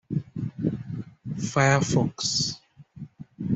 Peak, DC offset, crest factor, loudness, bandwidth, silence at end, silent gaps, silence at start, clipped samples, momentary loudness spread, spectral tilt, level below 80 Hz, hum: -8 dBFS; under 0.1%; 20 dB; -26 LUFS; 8.2 kHz; 0 s; none; 0.1 s; under 0.1%; 22 LU; -4.5 dB/octave; -56 dBFS; none